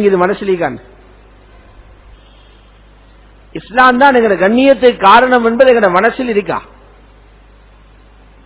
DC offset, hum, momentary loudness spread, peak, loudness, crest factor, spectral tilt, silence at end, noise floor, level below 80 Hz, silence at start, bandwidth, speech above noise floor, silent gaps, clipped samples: under 0.1%; 50 Hz at -40 dBFS; 14 LU; 0 dBFS; -10 LUFS; 12 dB; -9 dB/octave; 1.85 s; -42 dBFS; -42 dBFS; 0 s; 4 kHz; 32 dB; none; 1%